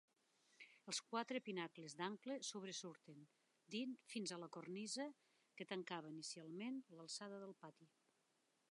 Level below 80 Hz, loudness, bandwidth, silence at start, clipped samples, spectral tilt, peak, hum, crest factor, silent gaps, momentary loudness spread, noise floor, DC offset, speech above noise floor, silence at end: under -90 dBFS; -50 LUFS; 11 kHz; 0.6 s; under 0.1%; -3 dB/octave; -30 dBFS; none; 22 dB; none; 16 LU; -84 dBFS; under 0.1%; 33 dB; 0.85 s